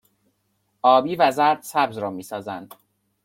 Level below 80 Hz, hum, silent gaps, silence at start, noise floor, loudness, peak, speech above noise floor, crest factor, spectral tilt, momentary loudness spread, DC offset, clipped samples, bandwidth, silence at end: -70 dBFS; none; none; 0.85 s; -70 dBFS; -21 LUFS; -4 dBFS; 50 dB; 18 dB; -4.5 dB/octave; 15 LU; under 0.1%; under 0.1%; 16.5 kHz; 0.6 s